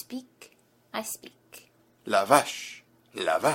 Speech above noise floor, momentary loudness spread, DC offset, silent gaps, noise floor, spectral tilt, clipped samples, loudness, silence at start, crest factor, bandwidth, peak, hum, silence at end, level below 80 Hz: 33 dB; 23 LU; under 0.1%; none; -59 dBFS; -3 dB/octave; under 0.1%; -27 LUFS; 0.1 s; 26 dB; 16.5 kHz; -2 dBFS; none; 0 s; -72 dBFS